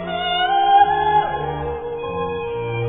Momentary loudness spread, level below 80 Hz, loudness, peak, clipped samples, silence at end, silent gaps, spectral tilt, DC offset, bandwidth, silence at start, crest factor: 12 LU; -42 dBFS; -19 LUFS; -2 dBFS; under 0.1%; 0 s; none; -8.5 dB/octave; under 0.1%; 3.9 kHz; 0 s; 18 dB